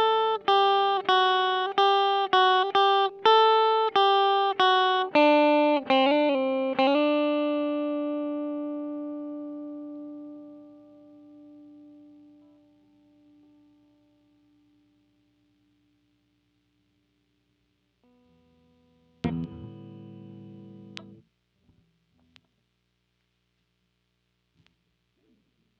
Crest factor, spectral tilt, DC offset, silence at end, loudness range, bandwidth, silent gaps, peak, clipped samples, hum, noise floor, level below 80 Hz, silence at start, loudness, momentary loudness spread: 20 dB; -5.5 dB/octave; under 0.1%; 4.75 s; 20 LU; 6.6 kHz; none; -8 dBFS; under 0.1%; 60 Hz at -75 dBFS; -75 dBFS; -70 dBFS; 0 s; -23 LUFS; 24 LU